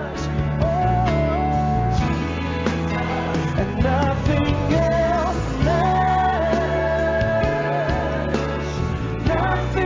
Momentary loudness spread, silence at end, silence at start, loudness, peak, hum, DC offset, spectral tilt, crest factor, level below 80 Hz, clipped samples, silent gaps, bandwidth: 5 LU; 0 s; 0 s; -21 LUFS; -6 dBFS; none; under 0.1%; -7 dB/octave; 14 dB; -28 dBFS; under 0.1%; none; 7.6 kHz